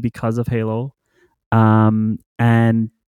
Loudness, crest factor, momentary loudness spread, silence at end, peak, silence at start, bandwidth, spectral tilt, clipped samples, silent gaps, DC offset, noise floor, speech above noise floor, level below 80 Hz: -17 LUFS; 14 dB; 10 LU; 0.25 s; -4 dBFS; 0 s; 9.6 kHz; -9 dB/octave; under 0.1%; 1.46-1.51 s, 2.26-2.36 s; under 0.1%; -60 dBFS; 44 dB; -50 dBFS